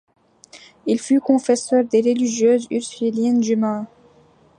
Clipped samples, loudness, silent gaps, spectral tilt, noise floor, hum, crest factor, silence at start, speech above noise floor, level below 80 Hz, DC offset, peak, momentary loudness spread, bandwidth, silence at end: under 0.1%; -19 LUFS; none; -5 dB/octave; -53 dBFS; none; 16 dB; 0.55 s; 35 dB; -70 dBFS; under 0.1%; -4 dBFS; 8 LU; 10.5 kHz; 0.7 s